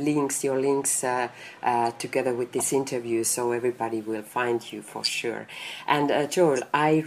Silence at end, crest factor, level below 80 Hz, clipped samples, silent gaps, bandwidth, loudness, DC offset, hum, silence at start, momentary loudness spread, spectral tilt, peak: 0 s; 22 dB; -72 dBFS; under 0.1%; none; 15.5 kHz; -26 LUFS; under 0.1%; none; 0 s; 8 LU; -3.5 dB/octave; -4 dBFS